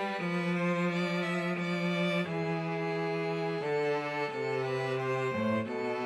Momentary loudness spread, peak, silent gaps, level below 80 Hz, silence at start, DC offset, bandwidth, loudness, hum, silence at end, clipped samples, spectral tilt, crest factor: 3 LU; -20 dBFS; none; -78 dBFS; 0 s; under 0.1%; 11 kHz; -32 LUFS; none; 0 s; under 0.1%; -6.5 dB/octave; 12 dB